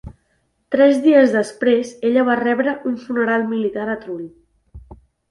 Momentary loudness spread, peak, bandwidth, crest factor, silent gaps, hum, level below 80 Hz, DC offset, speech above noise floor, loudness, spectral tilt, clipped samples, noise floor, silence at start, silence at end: 13 LU; -2 dBFS; 11.5 kHz; 18 dB; none; none; -50 dBFS; under 0.1%; 49 dB; -17 LUFS; -6 dB/octave; under 0.1%; -66 dBFS; 0.05 s; 0.35 s